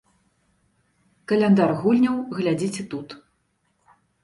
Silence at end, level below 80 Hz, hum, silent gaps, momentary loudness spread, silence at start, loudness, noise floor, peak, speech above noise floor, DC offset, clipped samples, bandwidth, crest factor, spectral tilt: 1.05 s; -64 dBFS; none; none; 22 LU; 1.3 s; -21 LUFS; -69 dBFS; -6 dBFS; 49 dB; under 0.1%; under 0.1%; 11.5 kHz; 18 dB; -7 dB/octave